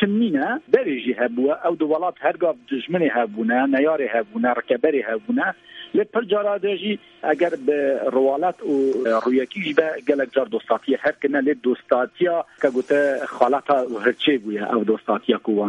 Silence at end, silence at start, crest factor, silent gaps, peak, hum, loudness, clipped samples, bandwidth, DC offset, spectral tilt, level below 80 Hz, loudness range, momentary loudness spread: 0 s; 0 s; 20 dB; none; 0 dBFS; none; -21 LUFS; under 0.1%; 9.2 kHz; under 0.1%; -6.5 dB/octave; -70 dBFS; 1 LU; 4 LU